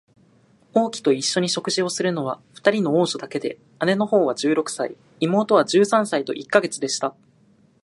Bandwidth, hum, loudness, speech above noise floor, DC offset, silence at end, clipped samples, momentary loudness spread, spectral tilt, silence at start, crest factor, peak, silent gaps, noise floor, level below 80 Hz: 11.5 kHz; none; -21 LUFS; 36 dB; under 0.1%; 0.75 s; under 0.1%; 10 LU; -4 dB/octave; 0.75 s; 20 dB; 0 dBFS; none; -57 dBFS; -72 dBFS